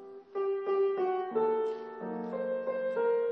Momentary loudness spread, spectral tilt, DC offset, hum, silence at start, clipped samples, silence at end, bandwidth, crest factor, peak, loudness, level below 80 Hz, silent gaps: 9 LU; -8 dB/octave; under 0.1%; none; 0 s; under 0.1%; 0 s; 5.6 kHz; 14 dB; -18 dBFS; -32 LUFS; under -90 dBFS; none